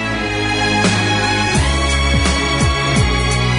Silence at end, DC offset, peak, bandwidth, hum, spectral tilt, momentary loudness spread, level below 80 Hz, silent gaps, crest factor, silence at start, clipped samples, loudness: 0 s; under 0.1%; -2 dBFS; 11 kHz; none; -4 dB/octave; 2 LU; -22 dBFS; none; 12 dB; 0 s; under 0.1%; -15 LUFS